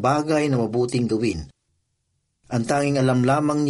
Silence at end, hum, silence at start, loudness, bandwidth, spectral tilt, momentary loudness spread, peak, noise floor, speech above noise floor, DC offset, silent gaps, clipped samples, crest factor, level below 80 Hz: 0 s; none; 0 s; -22 LUFS; 11.5 kHz; -6.5 dB/octave; 7 LU; -8 dBFS; -73 dBFS; 52 dB; under 0.1%; none; under 0.1%; 14 dB; -50 dBFS